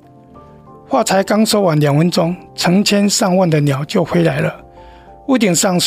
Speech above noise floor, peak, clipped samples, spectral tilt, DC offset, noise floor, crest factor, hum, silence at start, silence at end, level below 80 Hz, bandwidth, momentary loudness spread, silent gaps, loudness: 27 dB; -2 dBFS; under 0.1%; -5 dB/octave; under 0.1%; -41 dBFS; 12 dB; none; 0.35 s; 0 s; -50 dBFS; 16 kHz; 7 LU; none; -14 LUFS